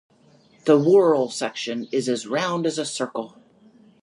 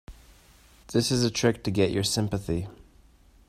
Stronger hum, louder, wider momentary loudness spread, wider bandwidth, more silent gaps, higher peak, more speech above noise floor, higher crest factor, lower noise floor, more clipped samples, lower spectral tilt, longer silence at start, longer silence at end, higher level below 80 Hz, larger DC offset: neither; first, -22 LUFS vs -26 LUFS; first, 13 LU vs 8 LU; second, 11.5 kHz vs 15 kHz; neither; first, -4 dBFS vs -8 dBFS; first, 35 dB vs 31 dB; about the same, 20 dB vs 20 dB; about the same, -56 dBFS vs -56 dBFS; neither; about the same, -5 dB/octave vs -5 dB/octave; first, 0.65 s vs 0.1 s; about the same, 0.75 s vs 0.75 s; second, -74 dBFS vs -50 dBFS; neither